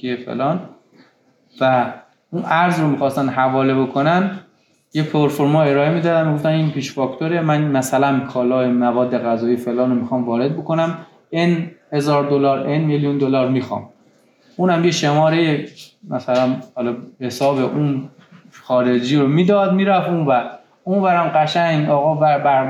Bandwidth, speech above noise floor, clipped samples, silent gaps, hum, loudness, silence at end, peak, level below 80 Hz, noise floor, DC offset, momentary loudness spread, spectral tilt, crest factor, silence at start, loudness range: 14 kHz; 40 dB; under 0.1%; none; none; -18 LUFS; 0 s; -4 dBFS; -72 dBFS; -56 dBFS; under 0.1%; 10 LU; -6.5 dB/octave; 14 dB; 0.05 s; 3 LU